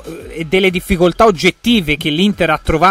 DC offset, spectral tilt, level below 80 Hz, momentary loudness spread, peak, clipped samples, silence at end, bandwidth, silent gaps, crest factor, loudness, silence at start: under 0.1%; -5 dB/octave; -30 dBFS; 5 LU; 0 dBFS; under 0.1%; 0 s; 16 kHz; none; 14 dB; -13 LUFS; 0.05 s